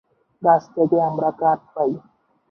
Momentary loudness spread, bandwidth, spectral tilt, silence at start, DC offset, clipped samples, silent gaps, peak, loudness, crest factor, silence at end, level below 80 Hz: 6 LU; 6.4 kHz; -9.5 dB/octave; 0.4 s; under 0.1%; under 0.1%; none; -2 dBFS; -20 LUFS; 18 dB; 0.5 s; -66 dBFS